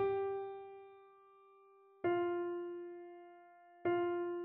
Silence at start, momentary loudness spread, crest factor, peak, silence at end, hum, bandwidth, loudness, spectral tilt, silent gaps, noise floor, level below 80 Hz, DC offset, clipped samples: 0 s; 22 LU; 16 dB; -24 dBFS; 0 s; none; 3.8 kHz; -39 LUFS; -5 dB/octave; none; -65 dBFS; -80 dBFS; under 0.1%; under 0.1%